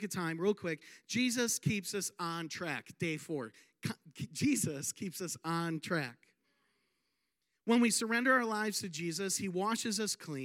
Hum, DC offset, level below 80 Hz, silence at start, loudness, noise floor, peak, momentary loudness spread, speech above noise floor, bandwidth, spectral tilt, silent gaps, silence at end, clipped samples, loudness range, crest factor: none; under 0.1%; -80 dBFS; 0 s; -35 LUFS; -84 dBFS; -16 dBFS; 13 LU; 49 dB; 16.5 kHz; -3.5 dB/octave; none; 0 s; under 0.1%; 5 LU; 20 dB